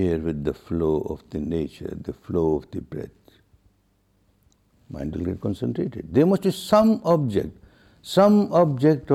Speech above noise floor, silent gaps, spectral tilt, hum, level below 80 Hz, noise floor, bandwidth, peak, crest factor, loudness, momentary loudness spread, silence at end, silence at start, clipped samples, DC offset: 43 dB; none; -7.5 dB/octave; none; -46 dBFS; -65 dBFS; 13.5 kHz; -6 dBFS; 18 dB; -23 LUFS; 16 LU; 0 s; 0 s; under 0.1%; under 0.1%